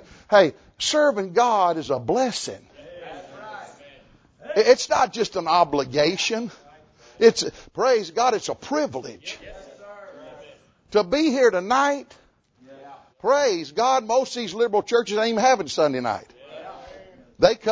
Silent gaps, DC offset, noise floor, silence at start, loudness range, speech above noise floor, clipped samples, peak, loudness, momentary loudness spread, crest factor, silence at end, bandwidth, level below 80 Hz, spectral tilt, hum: none; under 0.1%; -55 dBFS; 0.3 s; 4 LU; 35 dB; under 0.1%; -2 dBFS; -21 LUFS; 21 LU; 22 dB; 0 s; 8 kHz; -58 dBFS; -3.5 dB/octave; none